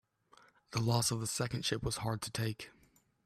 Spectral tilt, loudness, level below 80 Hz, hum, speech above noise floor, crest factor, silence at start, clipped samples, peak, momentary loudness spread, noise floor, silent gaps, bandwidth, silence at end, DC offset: -4 dB/octave; -35 LUFS; -58 dBFS; none; 30 dB; 20 dB; 0.7 s; under 0.1%; -18 dBFS; 9 LU; -66 dBFS; none; 14 kHz; 0.55 s; under 0.1%